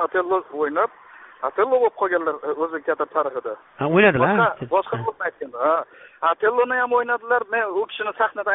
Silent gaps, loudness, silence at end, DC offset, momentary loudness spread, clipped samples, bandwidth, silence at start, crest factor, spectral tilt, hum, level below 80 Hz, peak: none; -21 LUFS; 0 s; under 0.1%; 9 LU; under 0.1%; 4 kHz; 0 s; 18 dB; -4 dB/octave; none; -62 dBFS; -2 dBFS